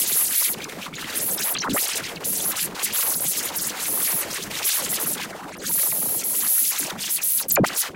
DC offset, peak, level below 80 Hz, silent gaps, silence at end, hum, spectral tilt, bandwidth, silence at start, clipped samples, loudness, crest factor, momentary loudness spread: under 0.1%; -6 dBFS; -58 dBFS; none; 0 s; none; -1 dB/octave; 17 kHz; 0 s; under 0.1%; -21 LUFS; 18 dB; 8 LU